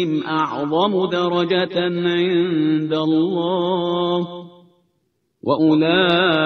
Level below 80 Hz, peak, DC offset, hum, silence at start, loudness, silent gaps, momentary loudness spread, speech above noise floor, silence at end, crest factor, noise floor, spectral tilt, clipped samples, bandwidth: -60 dBFS; -4 dBFS; under 0.1%; none; 0 s; -18 LUFS; none; 6 LU; 51 dB; 0 s; 16 dB; -69 dBFS; -7.5 dB/octave; under 0.1%; 6.4 kHz